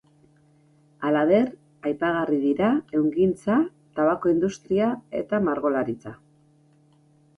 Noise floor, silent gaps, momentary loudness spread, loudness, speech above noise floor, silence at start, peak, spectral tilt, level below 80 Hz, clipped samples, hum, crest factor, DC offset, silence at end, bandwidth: -59 dBFS; none; 10 LU; -24 LUFS; 36 dB; 1 s; -8 dBFS; -7.5 dB/octave; -60 dBFS; under 0.1%; none; 16 dB; under 0.1%; 1.2 s; 11 kHz